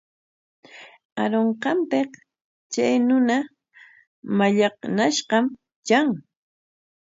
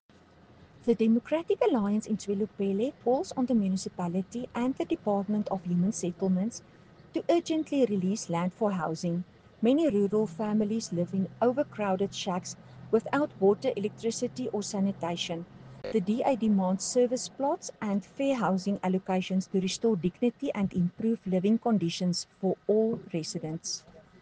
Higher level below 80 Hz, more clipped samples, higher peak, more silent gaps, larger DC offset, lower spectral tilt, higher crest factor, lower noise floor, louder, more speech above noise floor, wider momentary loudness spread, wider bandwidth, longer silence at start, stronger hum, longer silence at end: second, -72 dBFS vs -66 dBFS; neither; first, -6 dBFS vs -12 dBFS; first, 1.05-1.16 s, 2.44-2.70 s, 4.07-4.23 s, 5.76-5.83 s vs none; neither; second, -4.5 dB/octave vs -6 dB/octave; about the same, 18 dB vs 16 dB; second, -52 dBFS vs -57 dBFS; first, -22 LUFS vs -29 LUFS; about the same, 31 dB vs 28 dB; first, 13 LU vs 8 LU; second, 7.8 kHz vs 9.8 kHz; about the same, 0.75 s vs 0.85 s; neither; first, 0.8 s vs 0.2 s